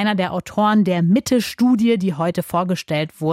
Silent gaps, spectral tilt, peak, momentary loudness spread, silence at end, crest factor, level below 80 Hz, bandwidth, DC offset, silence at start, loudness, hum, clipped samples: none; -6 dB/octave; -6 dBFS; 6 LU; 0 s; 12 dB; -56 dBFS; 16 kHz; under 0.1%; 0 s; -18 LUFS; none; under 0.1%